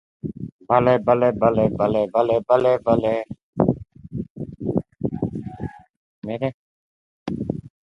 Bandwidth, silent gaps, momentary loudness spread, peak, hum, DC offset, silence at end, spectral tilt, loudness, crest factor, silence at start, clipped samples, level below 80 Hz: 6 kHz; 0.52-0.59 s, 3.43-3.53 s, 4.30-4.35 s, 5.90-6.22 s, 6.54-7.26 s; 17 LU; 0 dBFS; none; under 0.1%; 0.15 s; -9.5 dB/octave; -21 LUFS; 22 dB; 0.25 s; under 0.1%; -48 dBFS